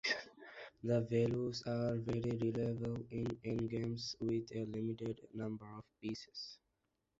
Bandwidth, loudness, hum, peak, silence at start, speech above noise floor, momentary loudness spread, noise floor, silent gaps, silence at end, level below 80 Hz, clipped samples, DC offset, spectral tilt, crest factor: 7.8 kHz; -40 LUFS; none; -22 dBFS; 0.05 s; 46 dB; 13 LU; -85 dBFS; none; 0.65 s; -66 dBFS; under 0.1%; under 0.1%; -6 dB/octave; 18 dB